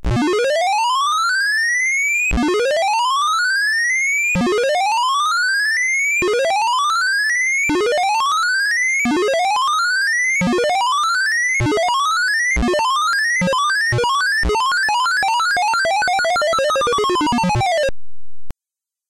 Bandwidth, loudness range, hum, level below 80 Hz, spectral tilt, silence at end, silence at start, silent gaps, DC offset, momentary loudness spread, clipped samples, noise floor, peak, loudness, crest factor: 16.5 kHz; 1 LU; none; -36 dBFS; -3 dB/octave; 0.6 s; 0.05 s; none; under 0.1%; 2 LU; under 0.1%; -87 dBFS; -12 dBFS; -16 LUFS; 6 dB